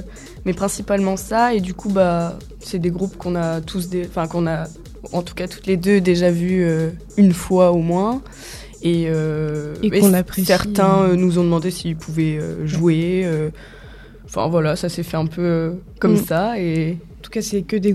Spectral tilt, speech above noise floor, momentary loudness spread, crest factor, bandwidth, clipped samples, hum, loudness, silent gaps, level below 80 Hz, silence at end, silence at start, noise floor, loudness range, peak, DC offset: -6.5 dB/octave; 21 dB; 12 LU; 18 dB; 15 kHz; under 0.1%; none; -19 LUFS; none; -42 dBFS; 0 s; 0 s; -39 dBFS; 4 LU; -2 dBFS; under 0.1%